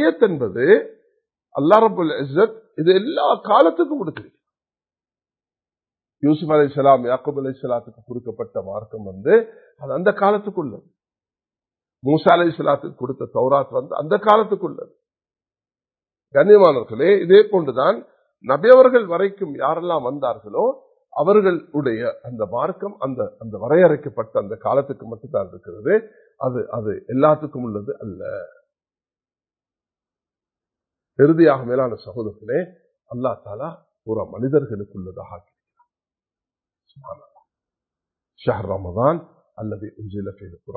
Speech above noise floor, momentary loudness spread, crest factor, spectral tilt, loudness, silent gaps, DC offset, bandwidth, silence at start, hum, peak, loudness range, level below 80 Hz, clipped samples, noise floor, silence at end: over 72 dB; 18 LU; 20 dB; -9.5 dB/octave; -18 LUFS; none; under 0.1%; 4.5 kHz; 0 s; none; 0 dBFS; 11 LU; -56 dBFS; under 0.1%; under -90 dBFS; 0 s